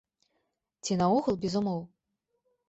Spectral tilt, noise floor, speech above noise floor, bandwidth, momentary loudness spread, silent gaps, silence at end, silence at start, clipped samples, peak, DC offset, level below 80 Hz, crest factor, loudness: -6 dB/octave; -81 dBFS; 53 dB; 8.2 kHz; 11 LU; none; 0.8 s; 0.85 s; under 0.1%; -16 dBFS; under 0.1%; -64 dBFS; 16 dB; -29 LUFS